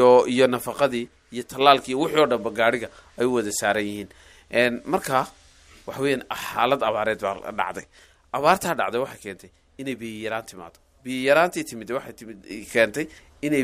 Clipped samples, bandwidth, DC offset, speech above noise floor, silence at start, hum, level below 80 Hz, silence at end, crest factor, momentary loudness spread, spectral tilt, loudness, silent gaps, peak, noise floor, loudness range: under 0.1%; 16 kHz; under 0.1%; 28 dB; 0 s; none; -58 dBFS; 0 s; 22 dB; 18 LU; -4 dB/octave; -23 LUFS; none; -2 dBFS; -51 dBFS; 5 LU